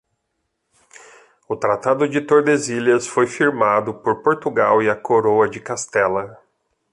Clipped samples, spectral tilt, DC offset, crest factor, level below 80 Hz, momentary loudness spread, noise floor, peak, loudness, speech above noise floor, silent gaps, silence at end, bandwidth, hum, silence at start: under 0.1%; -5 dB/octave; under 0.1%; 16 dB; -60 dBFS; 7 LU; -74 dBFS; -2 dBFS; -18 LUFS; 56 dB; none; 0.6 s; 11 kHz; none; 1.5 s